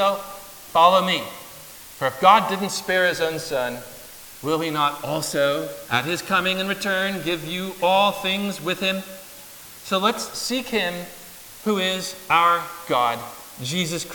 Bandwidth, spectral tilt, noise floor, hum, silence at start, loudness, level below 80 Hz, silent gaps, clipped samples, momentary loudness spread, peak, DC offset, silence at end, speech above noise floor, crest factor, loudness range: 19.5 kHz; -3.5 dB/octave; -42 dBFS; none; 0 s; -22 LUFS; -60 dBFS; none; under 0.1%; 20 LU; -2 dBFS; under 0.1%; 0 s; 20 dB; 20 dB; 5 LU